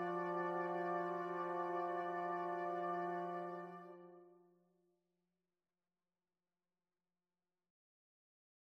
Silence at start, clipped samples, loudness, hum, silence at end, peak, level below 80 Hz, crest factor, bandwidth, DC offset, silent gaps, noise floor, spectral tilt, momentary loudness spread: 0 s; under 0.1%; -42 LUFS; none; 4.3 s; -30 dBFS; under -90 dBFS; 16 dB; 7.4 kHz; under 0.1%; none; under -90 dBFS; -8 dB/octave; 12 LU